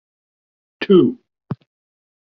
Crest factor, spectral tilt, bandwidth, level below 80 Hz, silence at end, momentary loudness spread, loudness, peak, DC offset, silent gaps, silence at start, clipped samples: 18 dB; -6.5 dB/octave; 5.2 kHz; -60 dBFS; 0.7 s; 19 LU; -15 LUFS; -2 dBFS; under 0.1%; none; 0.8 s; under 0.1%